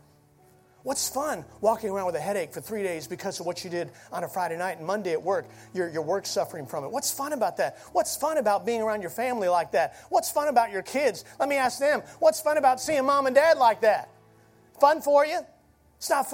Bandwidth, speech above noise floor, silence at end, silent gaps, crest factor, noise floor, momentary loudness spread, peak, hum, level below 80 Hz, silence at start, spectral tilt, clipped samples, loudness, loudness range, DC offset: 16.5 kHz; 33 dB; 0 s; none; 22 dB; -58 dBFS; 11 LU; -6 dBFS; none; -66 dBFS; 0.85 s; -3 dB/octave; under 0.1%; -26 LUFS; 8 LU; under 0.1%